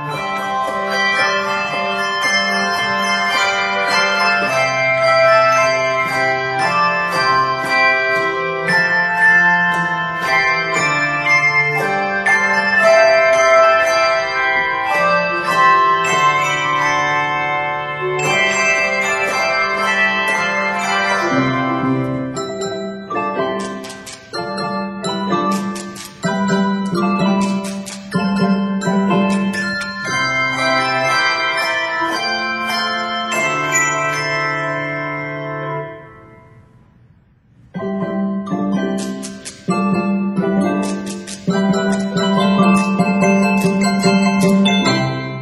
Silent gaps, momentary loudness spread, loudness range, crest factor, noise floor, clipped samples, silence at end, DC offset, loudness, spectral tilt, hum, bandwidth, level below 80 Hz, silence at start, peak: none; 11 LU; 9 LU; 16 dB; -51 dBFS; under 0.1%; 0 s; under 0.1%; -15 LUFS; -4.5 dB/octave; none; 13.5 kHz; -54 dBFS; 0 s; 0 dBFS